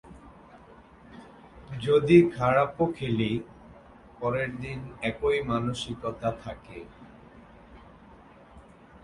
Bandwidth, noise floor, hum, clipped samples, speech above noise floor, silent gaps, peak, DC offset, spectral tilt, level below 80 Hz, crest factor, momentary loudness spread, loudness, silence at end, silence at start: 11 kHz; -52 dBFS; none; under 0.1%; 26 dB; none; -6 dBFS; under 0.1%; -7 dB/octave; -52 dBFS; 24 dB; 25 LU; -26 LUFS; 0.45 s; 0.05 s